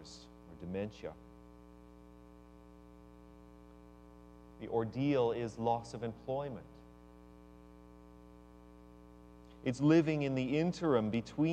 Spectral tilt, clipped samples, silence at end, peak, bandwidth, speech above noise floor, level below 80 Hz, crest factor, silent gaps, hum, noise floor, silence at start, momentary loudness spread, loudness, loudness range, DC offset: -7.5 dB/octave; under 0.1%; 0 s; -16 dBFS; 9.4 kHz; 23 dB; -62 dBFS; 20 dB; none; 60 Hz at -60 dBFS; -57 dBFS; 0 s; 26 LU; -35 LUFS; 21 LU; under 0.1%